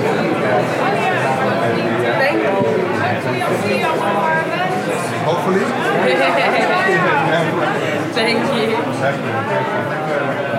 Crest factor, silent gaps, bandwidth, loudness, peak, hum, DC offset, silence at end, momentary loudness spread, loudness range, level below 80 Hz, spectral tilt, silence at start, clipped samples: 12 dB; none; 16.5 kHz; -16 LUFS; -4 dBFS; none; under 0.1%; 0 s; 5 LU; 2 LU; -72 dBFS; -5.5 dB/octave; 0 s; under 0.1%